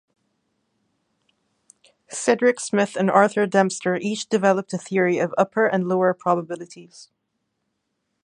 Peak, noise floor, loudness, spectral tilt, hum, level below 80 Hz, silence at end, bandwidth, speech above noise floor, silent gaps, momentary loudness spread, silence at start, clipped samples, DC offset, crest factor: -2 dBFS; -76 dBFS; -21 LUFS; -5 dB/octave; none; -74 dBFS; 1.2 s; 11 kHz; 55 dB; none; 8 LU; 2.1 s; under 0.1%; under 0.1%; 22 dB